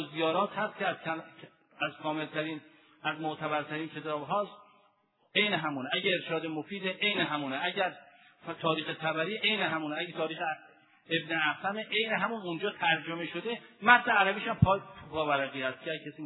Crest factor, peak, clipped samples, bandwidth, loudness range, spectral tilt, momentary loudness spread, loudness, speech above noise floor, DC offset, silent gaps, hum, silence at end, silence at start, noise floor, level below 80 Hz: 26 dB; -6 dBFS; under 0.1%; 4.1 kHz; 7 LU; -8.5 dB/octave; 10 LU; -31 LUFS; 38 dB; under 0.1%; none; none; 0 s; 0 s; -70 dBFS; -62 dBFS